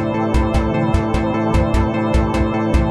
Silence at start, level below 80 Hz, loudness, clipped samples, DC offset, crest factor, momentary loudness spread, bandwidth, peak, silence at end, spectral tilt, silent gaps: 0 s; -22 dBFS; -18 LUFS; under 0.1%; under 0.1%; 14 dB; 1 LU; 11.5 kHz; -2 dBFS; 0 s; -7.5 dB/octave; none